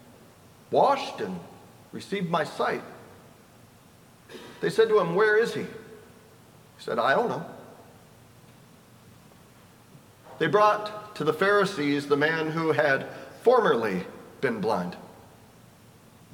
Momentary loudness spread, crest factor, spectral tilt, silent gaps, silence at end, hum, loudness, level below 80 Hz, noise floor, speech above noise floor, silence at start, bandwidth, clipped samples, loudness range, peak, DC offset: 20 LU; 22 dB; -5.5 dB/octave; none; 1.2 s; none; -25 LUFS; -70 dBFS; -54 dBFS; 29 dB; 0.7 s; 17.5 kHz; under 0.1%; 8 LU; -6 dBFS; under 0.1%